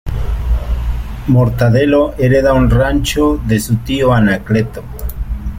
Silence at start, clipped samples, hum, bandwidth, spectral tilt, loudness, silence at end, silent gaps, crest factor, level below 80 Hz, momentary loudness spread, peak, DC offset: 0.05 s; under 0.1%; none; 16.5 kHz; -6.5 dB/octave; -14 LUFS; 0 s; none; 12 dB; -20 dBFS; 12 LU; -2 dBFS; under 0.1%